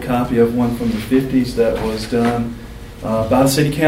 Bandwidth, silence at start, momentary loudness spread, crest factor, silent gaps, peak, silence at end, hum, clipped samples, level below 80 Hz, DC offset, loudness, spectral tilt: 16 kHz; 0 s; 11 LU; 16 dB; none; -2 dBFS; 0 s; none; under 0.1%; -36 dBFS; under 0.1%; -17 LUFS; -6 dB/octave